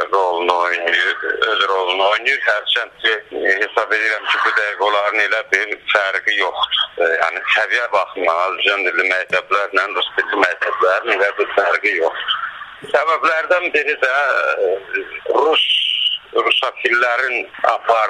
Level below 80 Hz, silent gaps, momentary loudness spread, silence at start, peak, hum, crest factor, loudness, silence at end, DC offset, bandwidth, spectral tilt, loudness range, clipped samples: -62 dBFS; none; 4 LU; 0 s; 0 dBFS; none; 18 dB; -16 LUFS; 0 s; under 0.1%; 11.5 kHz; -1 dB/octave; 1 LU; under 0.1%